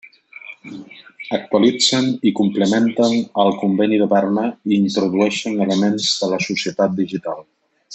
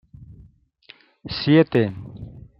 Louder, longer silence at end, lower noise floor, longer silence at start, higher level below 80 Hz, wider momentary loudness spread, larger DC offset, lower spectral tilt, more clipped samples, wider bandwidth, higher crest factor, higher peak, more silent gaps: first, -17 LUFS vs -20 LUFS; second, 0 s vs 0.2 s; second, -39 dBFS vs -52 dBFS; second, 0.05 s vs 0.3 s; second, -64 dBFS vs -52 dBFS; second, 18 LU vs 23 LU; neither; second, -4.5 dB/octave vs -9.5 dB/octave; neither; first, 8.4 kHz vs 5.8 kHz; about the same, 16 dB vs 20 dB; about the same, -2 dBFS vs -2 dBFS; neither